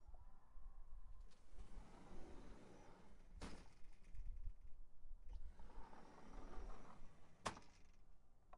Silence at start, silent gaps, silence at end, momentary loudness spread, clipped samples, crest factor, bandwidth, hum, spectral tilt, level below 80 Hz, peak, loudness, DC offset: 0 s; none; 0 s; 12 LU; under 0.1%; 22 dB; 11 kHz; none; -4.5 dB/octave; -58 dBFS; -30 dBFS; -61 LUFS; under 0.1%